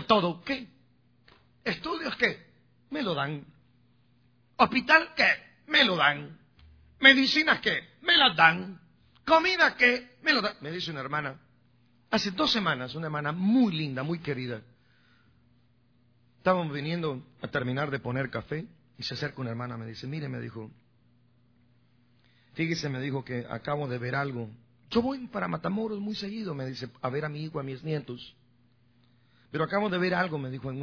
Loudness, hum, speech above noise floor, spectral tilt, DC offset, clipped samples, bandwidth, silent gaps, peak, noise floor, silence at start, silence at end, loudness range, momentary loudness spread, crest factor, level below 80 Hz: -27 LUFS; none; 38 dB; -5 dB/octave; under 0.1%; under 0.1%; 5.4 kHz; none; -2 dBFS; -66 dBFS; 0 s; 0 s; 14 LU; 17 LU; 28 dB; -64 dBFS